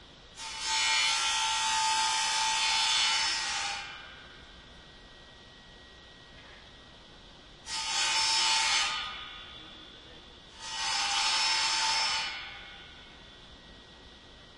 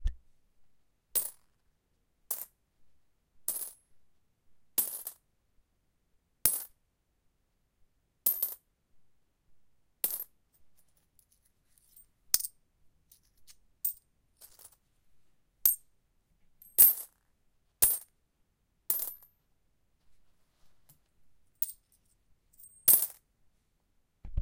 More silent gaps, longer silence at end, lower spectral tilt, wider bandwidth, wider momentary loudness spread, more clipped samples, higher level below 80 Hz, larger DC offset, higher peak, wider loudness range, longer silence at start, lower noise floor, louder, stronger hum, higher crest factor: neither; about the same, 0 s vs 0 s; second, 1.5 dB/octave vs -0.5 dB/octave; second, 11.5 kHz vs 17 kHz; first, 24 LU vs 20 LU; neither; second, -60 dBFS vs -54 dBFS; neither; second, -14 dBFS vs -4 dBFS; second, 10 LU vs 14 LU; about the same, 0 s vs 0 s; second, -52 dBFS vs -76 dBFS; about the same, -27 LUFS vs -29 LUFS; neither; second, 18 dB vs 34 dB